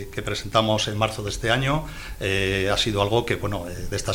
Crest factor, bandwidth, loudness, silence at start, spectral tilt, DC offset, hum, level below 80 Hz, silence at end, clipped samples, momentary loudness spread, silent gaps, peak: 18 dB; 18.5 kHz; -24 LUFS; 0 s; -4.5 dB/octave; under 0.1%; none; -38 dBFS; 0 s; under 0.1%; 8 LU; none; -6 dBFS